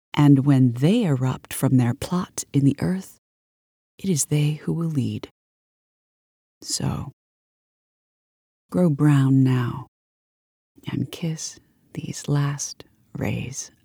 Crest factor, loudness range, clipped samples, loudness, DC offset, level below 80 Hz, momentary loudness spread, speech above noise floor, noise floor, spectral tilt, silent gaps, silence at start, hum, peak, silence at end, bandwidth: 20 dB; 8 LU; under 0.1%; -22 LUFS; under 0.1%; -56 dBFS; 16 LU; over 69 dB; under -90 dBFS; -6 dB/octave; 3.18-3.98 s, 5.31-6.61 s, 7.13-8.69 s, 9.88-10.75 s; 0.15 s; none; -4 dBFS; 0.2 s; 19.5 kHz